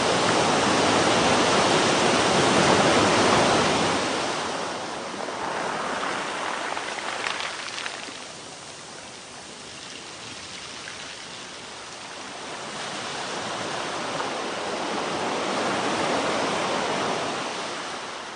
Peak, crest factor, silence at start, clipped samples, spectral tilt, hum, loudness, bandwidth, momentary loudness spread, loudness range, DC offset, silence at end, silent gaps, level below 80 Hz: -6 dBFS; 18 dB; 0 s; under 0.1%; -3 dB/octave; none; -24 LUFS; 10.5 kHz; 17 LU; 16 LU; under 0.1%; 0 s; none; -54 dBFS